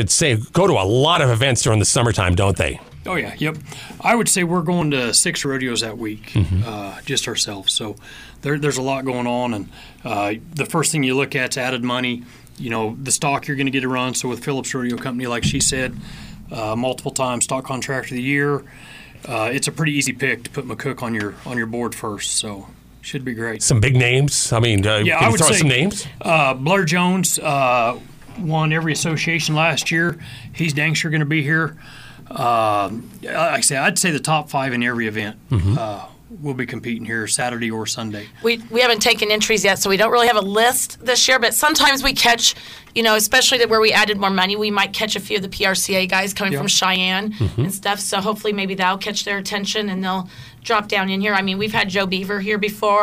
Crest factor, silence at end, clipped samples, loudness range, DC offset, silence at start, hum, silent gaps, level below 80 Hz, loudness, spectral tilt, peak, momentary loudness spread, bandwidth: 16 dB; 0 s; under 0.1%; 7 LU; under 0.1%; 0 s; none; none; -44 dBFS; -18 LUFS; -3.5 dB/octave; -2 dBFS; 12 LU; 16 kHz